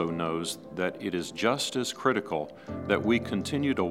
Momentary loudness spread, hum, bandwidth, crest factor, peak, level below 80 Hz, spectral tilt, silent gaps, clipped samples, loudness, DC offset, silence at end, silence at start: 8 LU; none; 16 kHz; 20 dB; -8 dBFS; -58 dBFS; -4.5 dB/octave; none; under 0.1%; -29 LUFS; under 0.1%; 0 s; 0 s